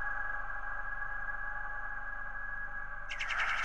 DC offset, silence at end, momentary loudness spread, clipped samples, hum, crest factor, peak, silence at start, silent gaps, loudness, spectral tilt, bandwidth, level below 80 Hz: 0.9%; 0 s; 6 LU; under 0.1%; none; 18 dB; -22 dBFS; 0 s; none; -38 LUFS; -2 dB/octave; 9.6 kHz; -46 dBFS